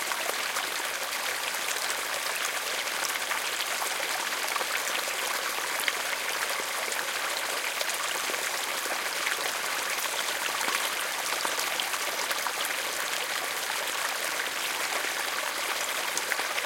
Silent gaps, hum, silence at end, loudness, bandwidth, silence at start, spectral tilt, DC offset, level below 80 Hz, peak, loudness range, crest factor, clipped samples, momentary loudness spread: none; none; 0 s; -28 LUFS; 17 kHz; 0 s; 1.5 dB/octave; under 0.1%; -74 dBFS; -8 dBFS; 1 LU; 22 dB; under 0.1%; 1 LU